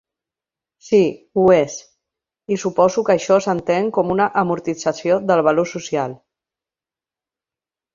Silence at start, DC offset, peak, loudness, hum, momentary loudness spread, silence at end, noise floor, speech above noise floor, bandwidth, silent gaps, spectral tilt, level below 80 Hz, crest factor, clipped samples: 0.85 s; under 0.1%; -2 dBFS; -18 LUFS; none; 8 LU; 1.8 s; under -90 dBFS; over 73 dB; 7.6 kHz; none; -5.5 dB/octave; -58 dBFS; 18 dB; under 0.1%